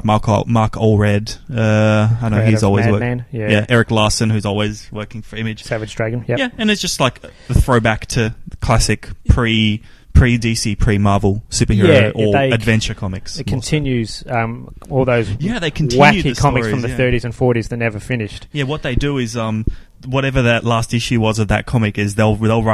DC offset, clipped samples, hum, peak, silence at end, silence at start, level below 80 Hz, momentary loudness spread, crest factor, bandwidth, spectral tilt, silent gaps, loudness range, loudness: under 0.1%; under 0.1%; none; 0 dBFS; 0 s; 0.05 s; -28 dBFS; 9 LU; 16 dB; 13 kHz; -5.5 dB/octave; none; 4 LU; -16 LUFS